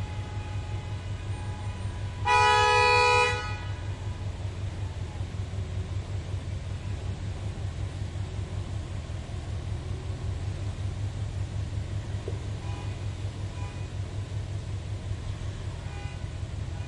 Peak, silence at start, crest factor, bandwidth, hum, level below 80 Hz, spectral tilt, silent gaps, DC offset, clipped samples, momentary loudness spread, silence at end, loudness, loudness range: -10 dBFS; 0 s; 20 dB; 11.5 kHz; none; -40 dBFS; -4.5 dB/octave; none; under 0.1%; under 0.1%; 14 LU; 0 s; -30 LUFS; 11 LU